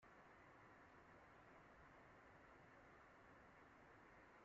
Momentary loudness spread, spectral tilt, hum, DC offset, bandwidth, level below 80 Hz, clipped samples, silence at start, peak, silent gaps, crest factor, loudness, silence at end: 0 LU; -4 dB/octave; none; under 0.1%; 7.4 kHz; -82 dBFS; under 0.1%; 0 s; -54 dBFS; none; 12 dB; -67 LUFS; 0 s